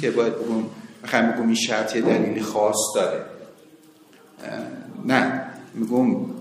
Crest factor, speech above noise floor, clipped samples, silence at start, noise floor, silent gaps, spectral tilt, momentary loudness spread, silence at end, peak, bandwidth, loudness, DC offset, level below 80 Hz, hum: 22 dB; 29 dB; under 0.1%; 0 s; -51 dBFS; none; -4 dB/octave; 15 LU; 0 s; -2 dBFS; 15 kHz; -23 LUFS; under 0.1%; -72 dBFS; none